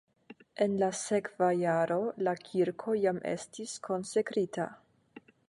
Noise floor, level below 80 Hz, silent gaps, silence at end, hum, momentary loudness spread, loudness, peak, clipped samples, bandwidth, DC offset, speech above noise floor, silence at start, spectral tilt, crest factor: -56 dBFS; -76 dBFS; none; 0.3 s; none; 9 LU; -32 LUFS; -14 dBFS; under 0.1%; 11.5 kHz; under 0.1%; 25 dB; 0.3 s; -5.5 dB/octave; 18 dB